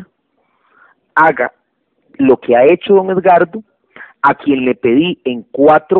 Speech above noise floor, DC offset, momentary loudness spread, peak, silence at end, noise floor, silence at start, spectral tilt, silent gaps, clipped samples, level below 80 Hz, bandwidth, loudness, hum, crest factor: 51 dB; under 0.1%; 9 LU; 0 dBFS; 0 s; -62 dBFS; 0 s; -8.5 dB/octave; none; under 0.1%; -54 dBFS; 4.2 kHz; -12 LUFS; none; 12 dB